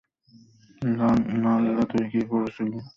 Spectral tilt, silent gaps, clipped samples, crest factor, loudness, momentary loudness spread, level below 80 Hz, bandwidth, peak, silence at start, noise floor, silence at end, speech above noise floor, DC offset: -8.5 dB/octave; none; under 0.1%; 14 dB; -24 LUFS; 7 LU; -56 dBFS; 7 kHz; -12 dBFS; 0.8 s; -56 dBFS; 0.1 s; 31 dB; under 0.1%